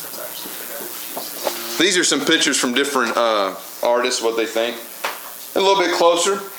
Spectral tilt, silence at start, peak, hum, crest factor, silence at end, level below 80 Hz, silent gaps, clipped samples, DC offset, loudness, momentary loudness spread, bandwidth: -1.5 dB/octave; 0 s; -2 dBFS; none; 18 dB; 0 s; -72 dBFS; none; under 0.1%; under 0.1%; -19 LUFS; 12 LU; over 20 kHz